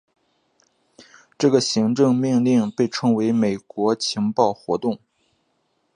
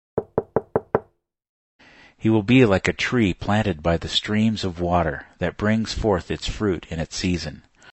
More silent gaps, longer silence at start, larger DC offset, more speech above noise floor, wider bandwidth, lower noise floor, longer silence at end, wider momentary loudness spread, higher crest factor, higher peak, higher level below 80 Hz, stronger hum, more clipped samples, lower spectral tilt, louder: second, none vs 1.49-1.79 s; first, 1.4 s vs 0.15 s; neither; first, 49 dB vs 34 dB; first, 10 kHz vs 8.4 kHz; first, -69 dBFS vs -55 dBFS; first, 1 s vs 0.4 s; second, 6 LU vs 10 LU; about the same, 18 dB vs 22 dB; about the same, -4 dBFS vs -2 dBFS; second, -64 dBFS vs -40 dBFS; neither; neither; about the same, -5.5 dB/octave vs -6 dB/octave; about the same, -20 LUFS vs -22 LUFS